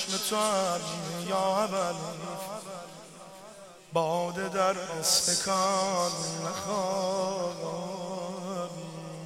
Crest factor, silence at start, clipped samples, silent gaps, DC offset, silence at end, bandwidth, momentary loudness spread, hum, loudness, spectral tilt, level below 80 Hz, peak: 20 dB; 0 s; under 0.1%; none; under 0.1%; 0 s; 16 kHz; 17 LU; none; -29 LUFS; -3 dB/octave; -70 dBFS; -12 dBFS